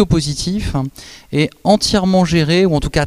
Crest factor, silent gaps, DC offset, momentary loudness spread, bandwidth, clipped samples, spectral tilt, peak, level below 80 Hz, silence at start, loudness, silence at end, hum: 14 dB; none; 0.2%; 9 LU; 14 kHz; under 0.1%; -5.5 dB/octave; 0 dBFS; -30 dBFS; 0 s; -15 LUFS; 0 s; none